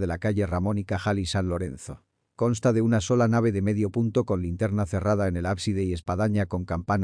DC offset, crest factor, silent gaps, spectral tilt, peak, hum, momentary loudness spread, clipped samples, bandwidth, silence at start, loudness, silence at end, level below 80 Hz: under 0.1%; 14 dB; none; -7 dB/octave; -12 dBFS; none; 7 LU; under 0.1%; 10.5 kHz; 0 s; -26 LUFS; 0 s; -46 dBFS